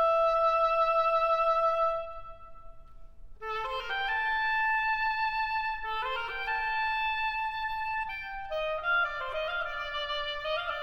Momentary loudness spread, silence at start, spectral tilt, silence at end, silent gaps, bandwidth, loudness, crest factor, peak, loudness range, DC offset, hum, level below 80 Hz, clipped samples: 9 LU; 0 s; -2 dB/octave; 0 s; none; 16 kHz; -29 LUFS; 14 dB; -16 dBFS; 3 LU; under 0.1%; none; -52 dBFS; under 0.1%